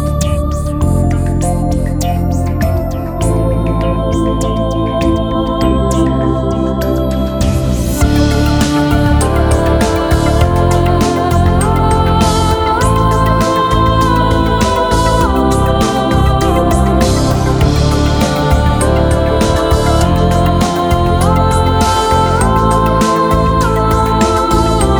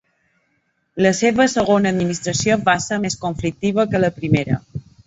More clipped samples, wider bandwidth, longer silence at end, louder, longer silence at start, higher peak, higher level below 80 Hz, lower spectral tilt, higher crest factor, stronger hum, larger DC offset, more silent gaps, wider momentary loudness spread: neither; first, over 20 kHz vs 8 kHz; second, 0 s vs 0.25 s; first, -12 LUFS vs -18 LUFS; second, 0 s vs 0.95 s; about the same, 0 dBFS vs -2 dBFS; first, -18 dBFS vs -46 dBFS; about the same, -6 dB/octave vs -5 dB/octave; second, 10 dB vs 16 dB; neither; neither; neither; second, 4 LU vs 8 LU